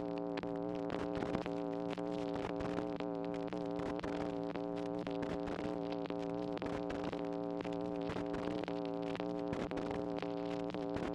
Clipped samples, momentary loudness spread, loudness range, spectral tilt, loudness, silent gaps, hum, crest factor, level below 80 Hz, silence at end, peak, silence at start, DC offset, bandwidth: under 0.1%; 1 LU; 0 LU; -7 dB/octave; -40 LUFS; none; none; 18 dB; -62 dBFS; 0 s; -22 dBFS; 0 s; under 0.1%; 10 kHz